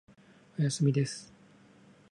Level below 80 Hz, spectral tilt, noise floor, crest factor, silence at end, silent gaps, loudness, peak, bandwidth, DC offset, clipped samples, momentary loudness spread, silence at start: -74 dBFS; -6 dB/octave; -59 dBFS; 18 dB; 0.85 s; none; -30 LUFS; -16 dBFS; 11.5 kHz; under 0.1%; under 0.1%; 16 LU; 0.6 s